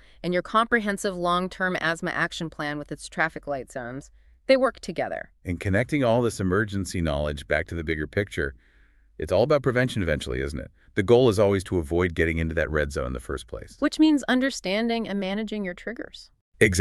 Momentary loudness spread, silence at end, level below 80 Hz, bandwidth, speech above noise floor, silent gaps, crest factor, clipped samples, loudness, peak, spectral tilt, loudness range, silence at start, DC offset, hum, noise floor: 13 LU; 0 s; -42 dBFS; 13.5 kHz; 32 dB; 16.41-16.52 s; 24 dB; under 0.1%; -25 LUFS; -2 dBFS; -5.5 dB/octave; 4 LU; 0.25 s; under 0.1%; none; -57 dBFS